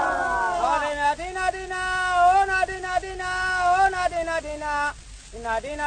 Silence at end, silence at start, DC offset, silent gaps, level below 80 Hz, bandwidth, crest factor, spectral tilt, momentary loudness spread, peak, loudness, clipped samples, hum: 0 s; 0 s; under 0.1%; none; -44 dBFS; 9.6 kHz; 14 dB; -3 dB/octave; 9 LU; -8 dBFS; -23 LUFS; under 0.1%; 50 Hz at -45 dBFS